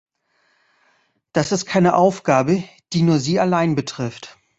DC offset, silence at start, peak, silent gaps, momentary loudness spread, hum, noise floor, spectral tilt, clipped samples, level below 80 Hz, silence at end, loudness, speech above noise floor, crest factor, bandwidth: under 0.1%; 1.35 s; -2 dBFS; none; 11 LU; none; -65 dBFS; -6 dB/octave; under 0.1%; -56 dBFS; 0.3 s; -19 LUFS; 47 dB; 18 dB; 8 kHz